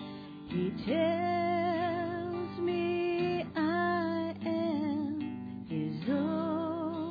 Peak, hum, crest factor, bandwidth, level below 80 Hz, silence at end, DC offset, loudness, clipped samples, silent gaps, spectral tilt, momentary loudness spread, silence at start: -18 dBFS; none; 14 dB; 5 kHz; -66 dBFS; 0 s; under 0.1%; -33 LUFS; under 0.1%; none; -5.5 dB/octave; 7 LU; 0 s